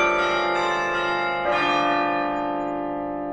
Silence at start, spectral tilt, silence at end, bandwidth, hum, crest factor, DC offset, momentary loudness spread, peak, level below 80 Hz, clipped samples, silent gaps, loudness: 0 s; -4 dB/octave; 0 s; 9.8 kHz; none; 14 dB; under 0.1%; 7 LU; -10 dBFS; -52 dBFS; under 0.1%; none; -23 LUFS